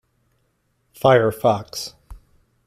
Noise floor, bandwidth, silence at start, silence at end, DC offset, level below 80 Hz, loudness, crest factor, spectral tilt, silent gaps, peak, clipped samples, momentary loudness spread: -68 dBFS; 16 kHz; 1.05 s; 0.5 s; under 0.1%; -50 dBFS; -19 LUFS; 20 dB; -5.5 dB/octave; none; -2 dBFS; under 0.1%; 15 LU